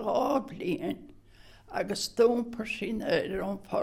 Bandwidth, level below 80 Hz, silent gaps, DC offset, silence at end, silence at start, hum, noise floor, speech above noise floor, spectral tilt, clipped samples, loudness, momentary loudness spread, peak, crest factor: 15.5 kHz; -56 dBFS; none; under 0.1%; 0 s; 0 s; none; -54 dBFS; 25 dB; -4.5 dB/octave; under 0.1%; -30 LUFS; 10 LU; -10 dBFS; 20 dB